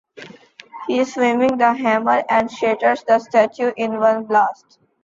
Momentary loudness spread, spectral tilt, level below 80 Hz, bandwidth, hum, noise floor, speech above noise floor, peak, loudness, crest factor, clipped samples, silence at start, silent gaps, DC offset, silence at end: 5 LU; -5 dB/octave; -62 dBFS; 7.8 kHz; none; -43 dBFS; 26 dB; -2 dBFS; -18 LUFS; 16 dB; under 0.1%; 0.15 s; none; under 0.1%; 0.5 s